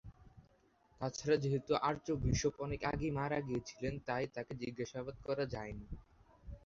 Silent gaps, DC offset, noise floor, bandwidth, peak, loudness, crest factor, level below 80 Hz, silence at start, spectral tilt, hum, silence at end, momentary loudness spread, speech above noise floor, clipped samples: none; under 0.1%; -71 dBFS; 7.6 kHz; -20 dBFS; -39 LUFS; 20 dB; -54 dBFS; 0.05 s; -5.5 dB/octave; none; 0.05 s; 12 LU; 33 dB; under 0.1%